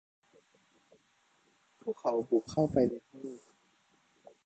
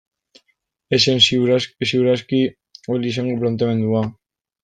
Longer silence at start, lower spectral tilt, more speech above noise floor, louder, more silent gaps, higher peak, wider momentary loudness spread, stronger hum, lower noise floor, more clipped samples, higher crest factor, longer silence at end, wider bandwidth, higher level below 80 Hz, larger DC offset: first, 1.85 s vs 0.9 s; first, -8 dB/octave vs -5 dB/octave; second, 39 dB vs 50 dB; second, -32 LUFS vs -18 LUFS; neither; second, -14 dBFS vs -2 dBFS; first, 18 LU vs 10 LU; neither; about the same, -71 dBFS vs -68 dBFS; neither; about the same, 22 dB vs 18 dB; first, 1.1 s vs 0.5 s; about the same, 8.6 kHz vs 9.4 kHz; second, -66 dBFS vs -58 dBFS; neither